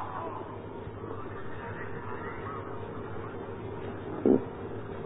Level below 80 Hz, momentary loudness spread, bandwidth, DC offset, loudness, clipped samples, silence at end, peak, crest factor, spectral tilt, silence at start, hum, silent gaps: -54 dBFS; 13 LU; 3.9 kHz; under 0.1%; -35 LUFS; under 0.1%; 0 s; -10 dBFS; 24 dB; -5 dB/octave; 0 s; none; none